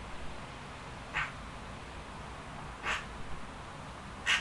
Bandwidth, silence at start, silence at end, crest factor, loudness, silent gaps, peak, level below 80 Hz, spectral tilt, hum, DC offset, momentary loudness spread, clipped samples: 11.5 kHz; 0 s; 0 s; 26 dB; -40 LUFS; none; -14 dBFS; -52 dBFS; -2.5 dB/octave; none; under 0.1%; 9 LU; under 0.1%